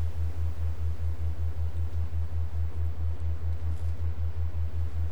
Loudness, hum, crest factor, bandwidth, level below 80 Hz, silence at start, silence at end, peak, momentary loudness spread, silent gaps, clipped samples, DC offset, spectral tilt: -33 LUFS; none; 8 dB; 5 kHz; -34 dBFS; 0 s; 0 s; -20 dBFS; 1 LU; none; under 0.1%; 4%; -8 dB/octave